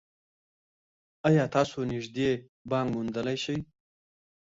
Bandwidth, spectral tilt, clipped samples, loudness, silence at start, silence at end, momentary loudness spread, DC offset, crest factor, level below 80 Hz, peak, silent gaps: 7.8 kHz; -6.5 dB/octave; under 0.1%; -29 LUFS; 1.25 s; 0.95 s; 9 LU; under 0.1%; 20 dB; -60 dBFS; -10 dBFS; 2.49-2.65 s